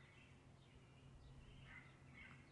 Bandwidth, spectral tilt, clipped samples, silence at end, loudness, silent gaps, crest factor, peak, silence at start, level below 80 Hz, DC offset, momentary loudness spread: 10.5 kHz; -5.5 dB/octave; under 0.1%; 0 s; -63 LUFS; none; 14 dB; -48 dBFS; 0 s; -72 dBFS; under 0.1%; 6 LU